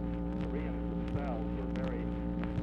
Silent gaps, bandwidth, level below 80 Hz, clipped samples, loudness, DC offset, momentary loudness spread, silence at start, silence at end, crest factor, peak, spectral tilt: none; 5.8 kHz; -40 dBFS; under 0.1%; -36 LUFS; under 0.1%; 1 LU; 0 s; 0 s; 12 dB; -22 dBFS; -9.5 dB/octave